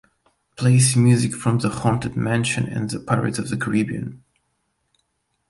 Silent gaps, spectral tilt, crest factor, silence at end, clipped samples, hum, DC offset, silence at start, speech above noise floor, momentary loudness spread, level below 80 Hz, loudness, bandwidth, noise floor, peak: none; -5.5 dB/octave; 18 dB; 1.35 s; under 0.1%; none; under 0.1%; 0.6 s; 52 dB; 10 LU; -52 dBFS; -20 LUFS; 11.5 kHz; -71 dBFS; -4 dBFS